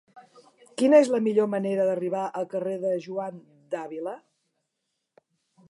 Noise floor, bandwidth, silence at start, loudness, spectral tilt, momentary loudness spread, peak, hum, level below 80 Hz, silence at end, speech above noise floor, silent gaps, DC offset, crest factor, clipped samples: -81 dBFS; 11.5 kHz; 0.15 s; -25 LUFS; -6.5 dB/octave; 17 LU; -6 dBFS; none; -84 dBFS; 1.55 s; 56 dB; none; under 0.1%; 20 dB; under 0.1%